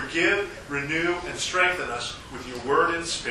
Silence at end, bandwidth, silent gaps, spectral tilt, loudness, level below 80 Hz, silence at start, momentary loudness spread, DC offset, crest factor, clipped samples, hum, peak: 0 s; 13 kHz; none; -3 dB/octave; -25 LUFS; -50 dBFS; 0 s; 11 LU; under 0.1%; 18 dB; under 0.1%; none; -8 dBFS